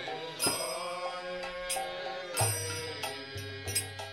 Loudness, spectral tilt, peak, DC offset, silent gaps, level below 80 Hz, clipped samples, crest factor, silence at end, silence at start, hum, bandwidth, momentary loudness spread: -34 LUFS; -2 dB/octave; -14 dBFS; under 0.1%; none; -62 dBFS; under 0.1%; 20 dB; 0 s; 0 s; none; 16 kHz; 8 LU